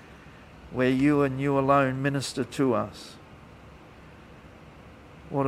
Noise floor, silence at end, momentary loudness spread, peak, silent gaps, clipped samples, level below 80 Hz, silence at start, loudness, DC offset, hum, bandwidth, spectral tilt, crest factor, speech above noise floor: -49 dBFS; 0 s; 16 LU; -8 dBFS; none; under 0.1%; -54 dBFS; 0.1 s; -25 LUFS; under 0.1%; none; 13.5 kHz; -6.5 dB/octave; 20 dB; 24 dB